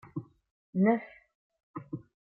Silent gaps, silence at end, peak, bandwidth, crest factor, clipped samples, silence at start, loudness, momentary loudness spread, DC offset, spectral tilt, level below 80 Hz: 0.51-0.73 s, 1.35-1.50 s, 1.63-1.74 s; 0.3 s; -14 dBFS; 3.4 kHz; 20 dB; under 0.1%; 0.15 s; -30 LUFS; 20 LU; under 0.1%; -9 dB/octave; -74 dBFS